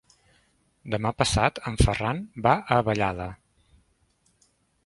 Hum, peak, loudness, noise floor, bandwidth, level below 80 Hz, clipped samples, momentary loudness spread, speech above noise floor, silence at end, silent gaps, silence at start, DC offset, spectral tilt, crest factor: none; -2 dBFS; -25 LUFS; -67 dBFS; 11.5 kHz; -38 dBFS; under 0.1%; 11 LU; 43 dB; 1.5 s; none; 0.85 s; under 0.1%; -5 dB/octave; 24 dB